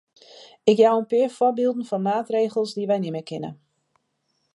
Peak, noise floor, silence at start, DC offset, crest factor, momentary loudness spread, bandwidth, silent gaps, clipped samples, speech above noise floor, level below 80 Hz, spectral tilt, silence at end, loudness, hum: -4 dBFS; -72 dBFS; 0.4 s; under 0.1%; 20 dB; 13 LU; 11.5 kHz; none; under 0.1%; 51 dB; -76 dBFS; -6.5 dB/octave; 1 s; -22 LUFS; none